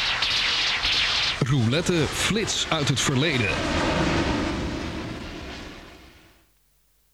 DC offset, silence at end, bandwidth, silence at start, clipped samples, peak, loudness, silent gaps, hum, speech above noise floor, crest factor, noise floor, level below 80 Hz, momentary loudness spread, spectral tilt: under 0.1%; 1.05 s; 16 kHz; 0 s; under 0.1%; -8 dBFS; -23 LUFS; none; none; 41 dB; 16 dB; -64 dBFS; -40 dBFS; 15 LU; -3.5 dB/octave